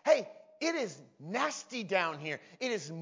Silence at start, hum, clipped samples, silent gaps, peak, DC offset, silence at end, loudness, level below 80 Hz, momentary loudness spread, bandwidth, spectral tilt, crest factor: 0.05 s; none; under 0.1%; none; -12 dBFS; under 0.1%; 0 s; -34 LUFS; under -90 dBFS; 10 LU; 7.6 kHz; -3.5 dB/octave; 22 dB